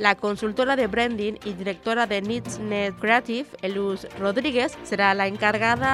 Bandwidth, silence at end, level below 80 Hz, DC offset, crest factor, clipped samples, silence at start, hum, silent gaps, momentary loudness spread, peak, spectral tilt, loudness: 13.5 kHz; 0 s; -54 dBFS; under 0.1%; 20 dB; under 0.1%; 0 s; none; none; 8 LU; -4 dBFS; -4.5 dB/octave; -24 LUFS